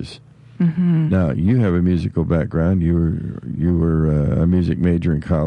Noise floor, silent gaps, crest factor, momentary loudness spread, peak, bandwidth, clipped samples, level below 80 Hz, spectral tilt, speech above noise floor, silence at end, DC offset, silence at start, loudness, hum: -41 dBFS; none; 10 dB; 5 LU; -8 dBFS; 5.4 kHz; under 0.1%; -36 dBFS; -10 dB/octave; 25 dB; 0 s; under 0.1%; 0 s; -18 LUFS; none